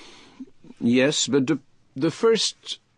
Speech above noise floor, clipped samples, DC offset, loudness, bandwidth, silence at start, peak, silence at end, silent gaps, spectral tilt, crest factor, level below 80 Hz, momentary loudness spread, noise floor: 23 dB; under 0.1%; under 0.1%; -22 LUFS; 10.5 kHz; 0 s; -8 dBFS; 0.2 s; none; -4 dB/octave; 16 dB; -66 dBFS; 9 LU; -44 dBFS